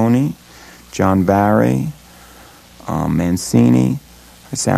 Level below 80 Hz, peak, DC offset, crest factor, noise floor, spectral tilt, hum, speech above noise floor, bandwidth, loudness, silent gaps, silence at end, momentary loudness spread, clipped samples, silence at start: -42 dBFS; 0 dBFS; under 0.1%; 16 dB; -42 dBFS; -6.5 dB/octave; none; 28 dB; 14 kHz; -16 LUFS; none; 0 s; 14 LU; under 0.1%; 0 s